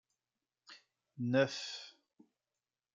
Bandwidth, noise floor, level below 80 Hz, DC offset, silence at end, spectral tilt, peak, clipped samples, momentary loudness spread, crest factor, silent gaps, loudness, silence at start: 7.8 kHz; under -90 dBFS; -90 dBFS; under 0.1%; 1.05 s; -5 dB/octave; -18 dBFS; under 0.1%; 25 LU; 22 dB; none; -36 LUFS; 0.7 s